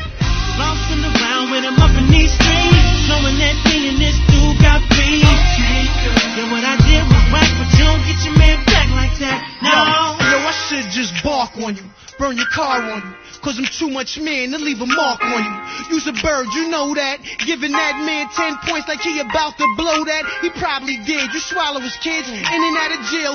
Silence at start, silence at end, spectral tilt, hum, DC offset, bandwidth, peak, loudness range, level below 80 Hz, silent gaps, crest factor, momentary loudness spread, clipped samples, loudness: 0 s; 0 s; -4.5 dB/octave; none; under 0.1%; 6.8 kHz; 0 dBFS; 7 LU; -20 dBFS; none; 14 dB; 9 LU; under 0.1%; -15 LUFS